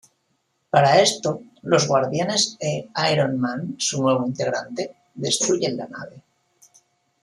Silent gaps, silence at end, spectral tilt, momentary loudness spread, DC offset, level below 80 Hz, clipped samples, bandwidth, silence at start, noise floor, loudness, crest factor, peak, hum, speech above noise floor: none; 1.05 s; -3.5 dB/octave; 15 LU; under 0.1%; -66 dBFS; under 0.1%; 13 kHz; 0.75 s; -70 dBFS; -21 LUFS; 20 dB; -2 dBFS; none; 49 dB